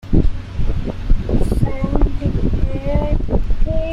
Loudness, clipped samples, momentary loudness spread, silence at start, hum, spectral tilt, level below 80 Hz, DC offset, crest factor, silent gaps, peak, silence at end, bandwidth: -21 LUFS; under 0.1%; 5 LU; 0.05 s; none; -9 dB/octave; -18 dBFS; under 0.1%; 14 dB; none; -2 dBFS; 0 s; 5.6 kHz